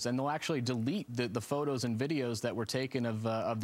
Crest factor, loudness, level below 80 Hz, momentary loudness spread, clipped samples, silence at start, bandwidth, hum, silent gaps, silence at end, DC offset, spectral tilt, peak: 16 dB; -34 LUFS; -72 dBFS; 2 LU; under 0.1%; 0 s; 16 kHz; none; none; 0 s; under 0.1%; -5.5 dB/octave; -18 dBFS